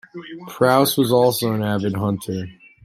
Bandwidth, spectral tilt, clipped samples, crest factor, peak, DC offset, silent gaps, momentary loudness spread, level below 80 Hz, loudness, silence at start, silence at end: 16 kHz; -5.5 dB/octave; under 0.1%; 18 dB; -2 dBFS; under 0.1%; none; 19 LU; -58 dBFS; -19 LUFS; 0.15 s; 0.3 s